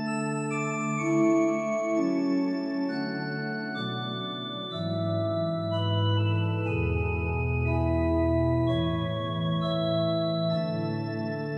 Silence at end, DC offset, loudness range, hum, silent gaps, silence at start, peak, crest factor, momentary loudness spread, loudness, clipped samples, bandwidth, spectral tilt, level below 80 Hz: 0 s; under 0.1%; 4 LU; none; none; 0 s; -14 dBFS; 14 dB; 7 LU; -28 LUFS; under 0.1%; 8.4 kHz; -7 dB/octave; -42 dBFS